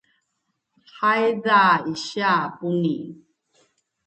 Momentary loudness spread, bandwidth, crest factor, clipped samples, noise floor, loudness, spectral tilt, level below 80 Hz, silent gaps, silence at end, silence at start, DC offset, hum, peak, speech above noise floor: 11 LU; 8.8 kHz; 18 dB; under 0.1%; -76 dBFS; -21 LUFS; -5.5 dB/octave; -72 dBFS; none; 0.9 s; 0.95 s; under 0.1%; none; -4 dBFS; 55 dB